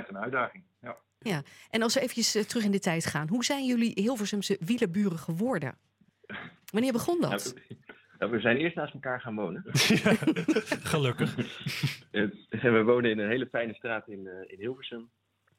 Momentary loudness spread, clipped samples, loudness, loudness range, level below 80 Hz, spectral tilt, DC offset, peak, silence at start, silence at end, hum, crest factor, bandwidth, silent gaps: 17 LU; under 0.1%; -29 LUFS; 3 LU; -70 dBFS; -4.5 dB/octave; under 0.1%; -10 dBFS; 0 s; 0.55 s; none; 20 dB; 16.5 kHz; none